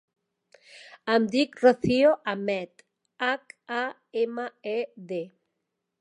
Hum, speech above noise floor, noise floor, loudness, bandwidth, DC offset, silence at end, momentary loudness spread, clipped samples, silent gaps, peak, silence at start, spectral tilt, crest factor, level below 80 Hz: none; 56 dB; -82 dBFS; -26 LUFS; 10.5 kHz; under 0.1%; 0.7 s; 14 LU; under 0.1%; none; -6 dBFS; 0.75 s; -5.5 dB/octave; 22 dB; -62 dBFS